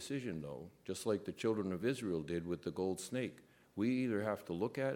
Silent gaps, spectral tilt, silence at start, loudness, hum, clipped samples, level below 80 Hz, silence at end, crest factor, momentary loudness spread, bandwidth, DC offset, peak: none; -6 dB/octave; 0 s; -40 LUFS; none; under 0.1%; -70 dBFS; 0 s; 18 dB; 9 LU; 17 kHz; under 0.1%; -22 dBFS